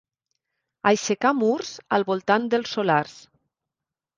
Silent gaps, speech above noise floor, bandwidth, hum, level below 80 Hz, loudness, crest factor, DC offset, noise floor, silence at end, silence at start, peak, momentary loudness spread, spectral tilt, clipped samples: none; 65 dB; 9.8 kHz; none; -70 dBFS; -23 LUFS; 22 dB; under 0.1%; -88 dBFS; 1 s; 0.85 s; -2 dBFS; 4 LU; -4.5 dB/octave; under 0.1%